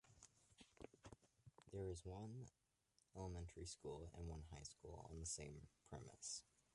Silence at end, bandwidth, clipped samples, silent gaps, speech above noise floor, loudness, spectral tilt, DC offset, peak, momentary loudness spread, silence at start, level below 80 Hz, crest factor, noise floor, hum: 0.3 s; 11.5 kHz; under 0.1%; none; 30 dB; -55 LUFS; -4.5 dB/octave; under 0.1%; -38 dBFS; 14 LU; 0.05 s; -66 dBFS; 18 dB; -84 dBFS; none